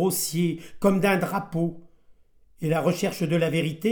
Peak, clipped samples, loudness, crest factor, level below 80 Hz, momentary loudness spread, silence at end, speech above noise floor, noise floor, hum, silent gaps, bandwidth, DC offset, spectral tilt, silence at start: -8 dBFS; under 0.1%; -25 LUFS; 16 dB; -58 dBFS; 6 LU; 0 s; 30 dB; -55 dBFS; none; none; 19.5 kHz; under 0.1%; -5.5 dB/octave; 0 s